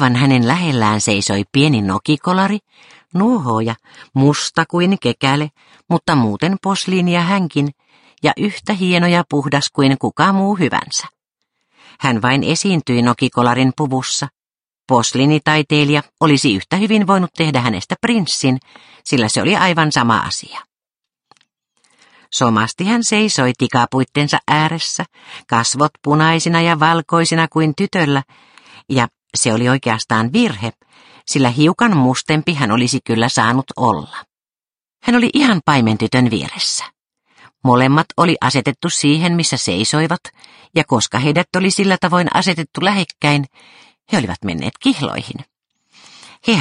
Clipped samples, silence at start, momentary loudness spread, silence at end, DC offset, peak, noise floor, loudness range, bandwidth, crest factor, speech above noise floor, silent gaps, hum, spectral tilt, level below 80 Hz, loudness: under 0.1%; 0 s; 8 LU; 0 s; under 0.1%; 0 dBFS; under -90 dBFS; 3 LU; 11 kHz; 16 dB; over 75 dB; none; none; -4.5 dB/octave; -54 dBFS; -15 LUFS